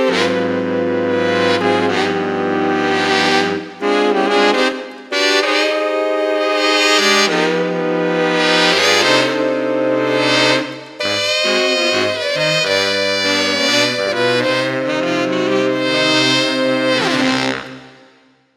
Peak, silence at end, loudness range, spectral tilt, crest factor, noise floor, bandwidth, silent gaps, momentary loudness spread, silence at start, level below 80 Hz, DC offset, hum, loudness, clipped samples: 0 dBFS; 0.7 s; 2 LU; -3 dB/octave; 16 dB; -51 dBFS; 15 kHz; none; 6 LU; 0 s; -64 dBFS; under 0.1%; none; -15 LUFS; under 0.1%